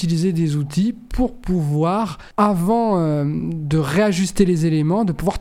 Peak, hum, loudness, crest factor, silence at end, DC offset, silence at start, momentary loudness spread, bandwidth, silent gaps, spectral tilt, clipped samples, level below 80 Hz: -2 dBFS; none; -19 LUFS; 16 dB; 0 s; under 0.1%; 0 s; 6 LU; 15.5 kHz; none; -7 dB/octave; under 0.1%; -36 dBFS